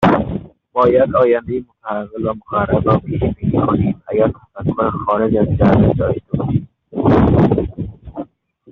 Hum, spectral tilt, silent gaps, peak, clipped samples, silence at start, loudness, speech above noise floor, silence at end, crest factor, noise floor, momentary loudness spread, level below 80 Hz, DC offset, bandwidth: none; -8 dB/octave; none; -2 dBFS; under 0.1%; 0 s; -16 LUFS; 23 dB; 0.5 s; 14 dB; -38 dBFS; 13 LU; -34 dBFS; under 0.1%; 6 kHz